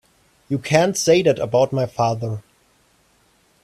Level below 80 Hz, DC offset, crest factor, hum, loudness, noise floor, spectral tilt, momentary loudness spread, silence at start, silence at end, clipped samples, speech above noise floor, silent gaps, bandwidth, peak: -56 dBFS; under 0.1%; 20 dB; none; -19 LUFS; -59 dBFS; -5 dB/octave; 11 LU; 0.5 s; 1.25 s; under 0.1%; 41 dB; none; 15 kHz; -2 dBFS